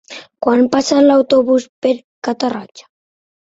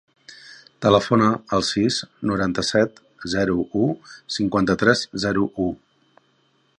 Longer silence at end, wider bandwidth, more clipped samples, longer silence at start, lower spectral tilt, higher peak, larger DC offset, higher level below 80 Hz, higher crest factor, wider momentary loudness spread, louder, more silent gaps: second, 0.7 s vs 1.05 s; second, 8 kHz vs 11 kHz; neither; second, 0.1 s vs 0.3 s; about the same, -4 dB/octave vs -5 dB/octave; about the same, 0 dBFS vs -2 dBFS; neither; second, -58 dBFS vs -50 dBFS; about the same, 16 dB vs 20 dB; about the same, 11 LU vs 11 LU; first, -14 LUFS vs -21 LUFS; first, 1.69-1.82 s, 2.04-2.22 s, 2.71-2.75 s vs none